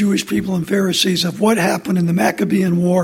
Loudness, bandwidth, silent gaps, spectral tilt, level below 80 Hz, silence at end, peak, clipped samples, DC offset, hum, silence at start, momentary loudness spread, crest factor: -16 LUFS; 16.5 kHz; none; -5 dB/octave; -52 dBFS; 0 s; -2 dBFS; under 0.1%; under 0.1%; none; 0 s; 4 LU; 14 dB